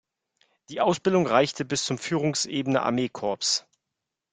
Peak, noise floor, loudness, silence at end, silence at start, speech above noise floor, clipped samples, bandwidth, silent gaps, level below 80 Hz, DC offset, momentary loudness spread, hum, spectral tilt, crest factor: -4 dBFS; -85 dBFS; -25 LUFS; 0.7 s; 0.7 s; 60 dB; under 0.1%; 9.6 kHz; none; -66 dBFS; under 0.1%; 6 LU; none; -4 dB/octave; 22 dB